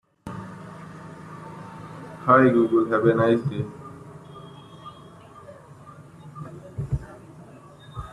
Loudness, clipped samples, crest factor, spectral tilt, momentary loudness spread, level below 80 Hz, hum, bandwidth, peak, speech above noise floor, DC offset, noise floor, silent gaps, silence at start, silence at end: -21 LUFS; under 0.1%; 22 dB; -8.5 dB/octave; 27 LU; -50 dBFS; none; 11 kHz; -4 dBFS; 27 dB; under 0.1%; -46 dBFS; none; 0.25 s; 0 s